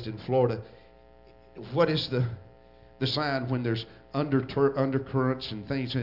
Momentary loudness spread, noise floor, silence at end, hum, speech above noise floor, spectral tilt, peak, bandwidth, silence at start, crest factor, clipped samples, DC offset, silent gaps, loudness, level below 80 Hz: 9 LU; -55 dBFS; 0 s; none; 27 dB; -8 dB/octave; -10 dBFS; 5.8 kHz; 0 s; 18 dB; under 0.1%; under 0.1%; none; -28 LUFS; -58 dBFS